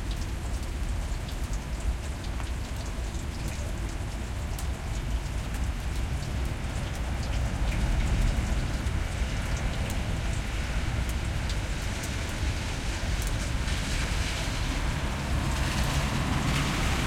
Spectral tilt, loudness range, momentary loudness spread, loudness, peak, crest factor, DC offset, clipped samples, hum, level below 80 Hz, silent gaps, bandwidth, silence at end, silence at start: -4.5 dB/octave; 5 LU; 7 LU; -31 LUFS; -14 dBFS; 14 dB; under 0.1%; under 0.1%; none; -32 dBFS; none; 16.5 kHz; 0 s; 0 s